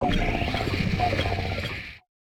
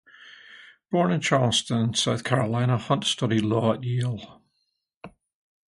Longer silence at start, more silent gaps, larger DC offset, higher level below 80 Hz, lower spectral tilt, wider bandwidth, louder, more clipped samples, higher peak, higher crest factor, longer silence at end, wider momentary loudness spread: second, 0 s vs 0.25 s; second, none vs 4.96-5.01 s; neither; first, -34 dBFS vs -60 dBFS; about the same, -6 dB/octave vs -5 dB/octave; first, 18 kHz vs 11.5 kHz; second, -27 LUFS vs -24 LUFS; neither; second, -12 dBFS vs -4 dBFS; second, 16 dB vs 22 dB; second, 0.25 s vs 0.6 s; about the same, 9 LU vs 7 LU